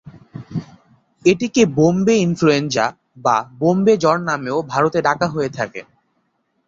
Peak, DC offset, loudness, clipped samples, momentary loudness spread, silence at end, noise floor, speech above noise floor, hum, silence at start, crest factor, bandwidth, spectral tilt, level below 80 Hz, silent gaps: -2 dBFS; under 0.1%; -17 LUFS; under 0.1%; 15 LU; 0.85 s; -67 dBFS; 50 dB; none; 0.05 s; 18 dB; 7.6 kHz; -5.5 dB/octave; -54 dBFS; none